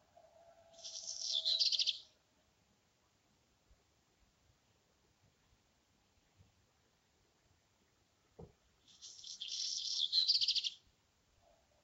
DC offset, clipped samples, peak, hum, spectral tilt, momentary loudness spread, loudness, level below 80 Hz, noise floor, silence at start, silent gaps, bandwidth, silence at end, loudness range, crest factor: under 0.1%; under 0.1%; -20 dBFS; none; 2 dB/octave; 20 LU; -34 LUFS; -80 dBFS; -76 dBFS; 0.75 s; none; 16 kHz; 1.05 s; 13 LU; 24 dB